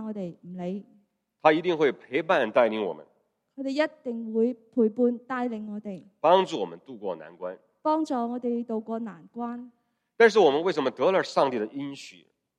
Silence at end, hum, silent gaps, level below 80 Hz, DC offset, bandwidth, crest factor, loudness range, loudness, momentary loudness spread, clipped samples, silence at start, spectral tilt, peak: 0.45 s; none; none; -78 dBFS; under 0.1%; 9.8 kHz; 24 dB; 4 LU; -26 LUFS; 16 LU; under 0.1%; 0 s; -5.5 dB/octave; -4 dBFS